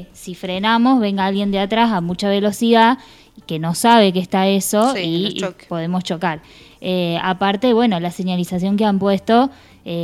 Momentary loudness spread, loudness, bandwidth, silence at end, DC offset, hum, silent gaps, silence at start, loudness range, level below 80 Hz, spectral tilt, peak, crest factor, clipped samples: 12 LU; -17 LUFS; 15 kHz; 0 s; under 0.1%; none; none; 0 s; 4 LU; -52 dBFS; -5 dB/octave; 0 dBFS; 18 dB; under 0.1%